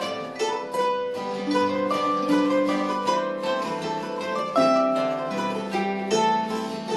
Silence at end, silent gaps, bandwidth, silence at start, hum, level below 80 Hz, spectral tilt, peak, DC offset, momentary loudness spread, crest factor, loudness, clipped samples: 0 s; none; 12.5 kHz; 0 s; none; -70 dBFS; -4.5 dB/octave; -8 dBFS; under 0.1%; 7 LU; 16 dB; -24 LUFS; under 0.1%